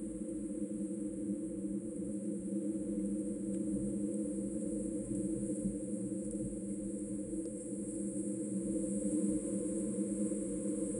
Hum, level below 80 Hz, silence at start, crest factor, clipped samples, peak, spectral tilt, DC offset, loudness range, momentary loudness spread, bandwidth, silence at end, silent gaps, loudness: none; -60 dBFS; 0 s; 14 dB; under 0.1%; -24 dBFS; -7.5 dB/octave; under 0.1%; 2 LU; 4 LU; 11 kHz; 0 s; none; -38 LUFS